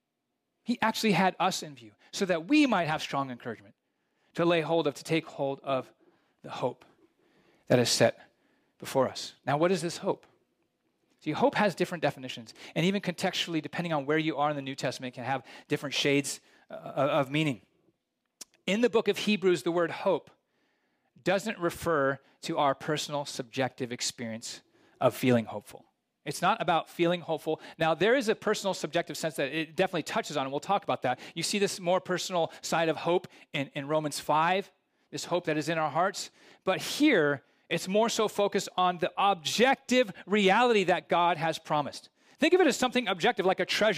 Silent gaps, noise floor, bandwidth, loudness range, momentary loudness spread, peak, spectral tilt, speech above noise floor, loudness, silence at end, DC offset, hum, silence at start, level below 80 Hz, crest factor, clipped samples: none; -83 dBFS; 15.5 kHz; 5 LU; 12 LU; -10 dBFS; -4.5 dB/octave; 54 dB; -29 LUFS; 0 s; under 0.1%; none; 0.7 s; -72 dBFS; 20 dB; under 0.1%